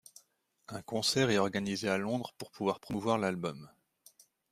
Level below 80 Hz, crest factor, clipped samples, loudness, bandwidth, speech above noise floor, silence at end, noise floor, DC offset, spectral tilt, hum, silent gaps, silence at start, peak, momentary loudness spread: -68 dBFS; 20 dB; under 0.1%; -33 LUFS; 15.5 kHz; 39 dB; 0.85 s; -72 dBFS; under 0.1%; -4.5 dB/octave; none; none; 0.7 s; -14 dBFS; 15 LU